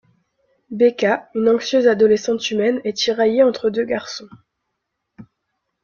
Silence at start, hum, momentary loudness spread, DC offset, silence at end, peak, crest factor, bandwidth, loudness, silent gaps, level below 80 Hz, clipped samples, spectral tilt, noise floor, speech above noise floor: 0.7 s; none; 9 LU; under 0.1%; 0.6 s; -2 dBFS; 16 dB; 7.2 kHz; -18 LUFS; none; -62 dBFS; under 0.1%; -4.5 dB/octave; -76 dBFS; 59 dB